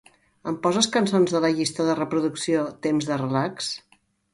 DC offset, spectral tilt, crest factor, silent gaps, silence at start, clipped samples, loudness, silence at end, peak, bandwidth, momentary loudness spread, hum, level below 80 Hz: under 0.1%; -4.5 dB/octave; 18 dB; none; 0.45 s; under 0.1%; -24 LUFS; 0.55 s; -6 dBFS; 11.5 kHz; 10 LU; none; -66 dBFS